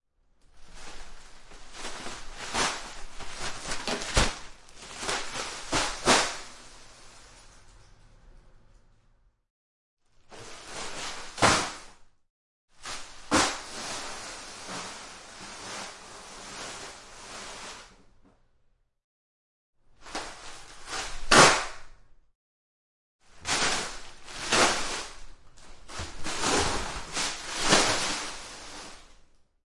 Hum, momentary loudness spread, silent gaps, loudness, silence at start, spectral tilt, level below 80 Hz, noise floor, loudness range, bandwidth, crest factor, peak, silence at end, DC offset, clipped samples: none; 22 LU; 9.50-9.97 s, 12.30-12.68 s, 19.04-19.73 s, 22.35-23.19 s; -27 LUFS; 0.55 s; -2 dB/octave; -46 dBFS; -67 dBFS; 17 LU; 11.5 kHz; 28 dB; -4 dBFS; 0.5 s; under 0.1%; under 0.1%